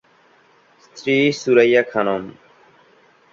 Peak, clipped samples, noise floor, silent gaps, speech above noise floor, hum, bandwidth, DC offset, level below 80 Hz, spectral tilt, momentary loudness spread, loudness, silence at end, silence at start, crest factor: -2 dBFS; under 0.1%; -54 dBFS; none; 38 dB; none; 7.6 kHz; under 0.1%; -64 dBFS; -5 dB/octave; 14 LU; -17 LUFS; 1 s; 0.95 s; 18 dB